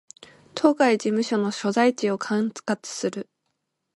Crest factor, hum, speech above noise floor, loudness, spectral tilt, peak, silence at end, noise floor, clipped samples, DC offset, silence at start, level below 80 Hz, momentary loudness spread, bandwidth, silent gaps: 20 dB; none; 54 dB; -23 LUFS; -4.5 dB/octave; -4 dBFS; 0.75 s; -77 dBFS; under 0.1%; under 0.1%; 0.55 s; -74 dBFS; 10 LU; 11.5 kHz; none